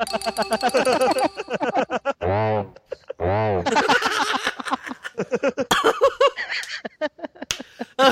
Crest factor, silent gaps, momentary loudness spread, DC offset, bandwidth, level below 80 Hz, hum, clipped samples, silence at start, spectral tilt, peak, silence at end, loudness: 22 dB; none; 11 LU; under 0.1%; 16 kHz; -54 dBFS; none; under 0.1%; 0 s; -4 dB/octave; 0 dBFS; 0 s; -22 LUFS